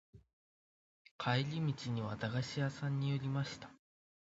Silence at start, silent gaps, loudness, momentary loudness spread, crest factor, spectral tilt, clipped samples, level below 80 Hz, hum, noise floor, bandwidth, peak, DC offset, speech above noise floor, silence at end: 0.15 s; 0.33-1.05 s, 1.11-1.19 s; -38 LUFS; 7 LU; 22 dB; -5.5 dB/octave; under 0.1%; -70 dBFS; none; under -90 dBFS; 7.6 kHz; -18 dBFS; under 0.1%; over 53 dB; 0.5 s